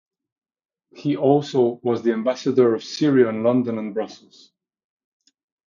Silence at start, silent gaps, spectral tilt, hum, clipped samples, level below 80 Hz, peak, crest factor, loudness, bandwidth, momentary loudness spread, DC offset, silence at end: 0.95 s; none; -7 dB/octave; none; under 0.1%; -72 dBFS; -4 dBFS; 18 dB; -21 LUFS; 7.4 kHz; 10 LU; under 0.1%; 1.5 s